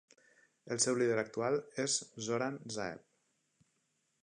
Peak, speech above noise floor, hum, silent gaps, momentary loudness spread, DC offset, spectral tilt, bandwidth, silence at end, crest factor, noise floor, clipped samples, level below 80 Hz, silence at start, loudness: -18 dBFS; 44 dB; none; none; 10 LU; under 0.1%; -3 dB/octave; 10.5 kHz; 1.25 s; 20 dB; -80 dBFS; under 0.1%; -78 dBFS; 0.65 s; -35 LUFS